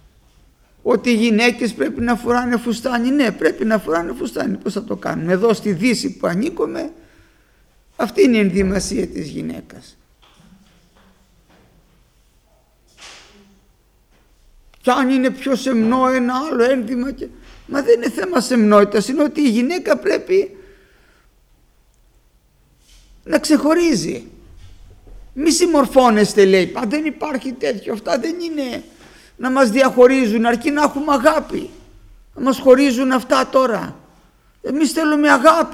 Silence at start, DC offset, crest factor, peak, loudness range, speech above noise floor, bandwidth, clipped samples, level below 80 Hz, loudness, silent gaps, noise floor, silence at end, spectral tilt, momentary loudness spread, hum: 0.85 s; under 0.1%; 18 dB; 0 dBFS; 7 LU; 40 dB; 15.5 kHz; under 0.1%; -46 dBFS; -17 LUFS; none; -56 dBFS; 0 s; -5 dB/octave; 12 LU; none